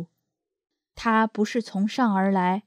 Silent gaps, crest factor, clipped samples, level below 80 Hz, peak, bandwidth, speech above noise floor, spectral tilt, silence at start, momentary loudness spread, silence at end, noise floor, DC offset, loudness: none; 16 dB; under 0.1%; -62 dBFS; -10 dBFS; 10.5 kHz; 59 dB; -6.5 dB/octave; 0 s; 6 LU; 0.05 s; -82 dBFS; under 0.1%; -24 LUFS